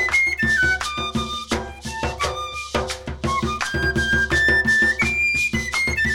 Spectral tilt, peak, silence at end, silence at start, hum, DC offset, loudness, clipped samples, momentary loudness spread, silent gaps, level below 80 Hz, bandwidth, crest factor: -3.5 dB/octave; -6 dBFS; 0 s; 0 s; none; under 0.1%; -20 LUFS; under 0.1%; 11 LU; none; -34 dBFS; 18 kHz; 16 dB